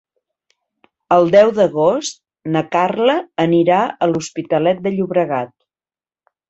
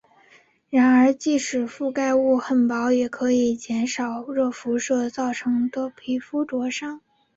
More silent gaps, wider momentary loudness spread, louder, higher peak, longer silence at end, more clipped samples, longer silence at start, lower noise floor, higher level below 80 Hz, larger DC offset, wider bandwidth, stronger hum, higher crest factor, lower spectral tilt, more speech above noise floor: neither; about the same, 11 LU vs 9 LU; first, -16 LUFS vs -22 LUFS; first, 0 dBFS vs -8 dBFS; first, 1.05 s vs 0.4 s; neither; first, 1.1 s vs 0.7 s; first, under -90 dBFS vs -56 dBFS; about the same, -60 dBFS vs -64 dBFS; neither; about the same, 8.2 kHz vs 8 kHz; neither; about the same, 16 dB vs 14 dB; first, -5.5 dB/octave vs -4 dB/octave; first, over 75 dB vs 35 dB